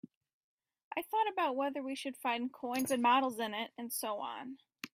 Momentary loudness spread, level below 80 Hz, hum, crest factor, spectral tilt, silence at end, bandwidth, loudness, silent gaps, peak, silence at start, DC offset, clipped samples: 13 LU; -84 dBFS; none; 18 dB; -2.5 dB/octave; 0.05 s; 16 kHz; -35 LUFS; 0.16-0.21 s, 0.33-0.58 s, 0.84-0.91 s; -18 dBFS; 0.05 s; under 0.1%; under 0.1%